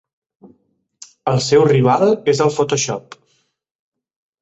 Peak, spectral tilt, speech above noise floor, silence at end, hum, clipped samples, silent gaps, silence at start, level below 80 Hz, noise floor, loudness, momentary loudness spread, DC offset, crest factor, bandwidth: -2 dBFS; -5 dB/octave; 49 dB; 1.4 s; none; under 0.1%; none; 1.25 s; -56 dBFS; -64 dBFS; -15 LUFS; 10 LU; under 0.1%; 16 dB; 8.2 kHz